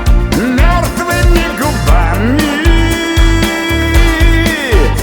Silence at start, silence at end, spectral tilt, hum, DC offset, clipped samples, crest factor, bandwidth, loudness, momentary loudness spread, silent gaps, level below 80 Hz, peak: 0 s; 0 s; -5 dB/octave; none; under 0.1%; 0.2%; 10 dB; 20 kHz; -11 LUFS; 2 LU; none; -12 dBFS; 0 dBFS